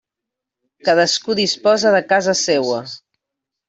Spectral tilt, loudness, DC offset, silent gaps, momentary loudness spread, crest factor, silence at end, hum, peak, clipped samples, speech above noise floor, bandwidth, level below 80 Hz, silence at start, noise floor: -3 dB/octave; -16 LUFS; under 0.1%; none; 10 LU; 16 dB; 0.7 s; none; -2 dBFS; under 0.1%; 67 dB; 8.4 kHz; -62 dBFS; 0.85 s; -83 dBFS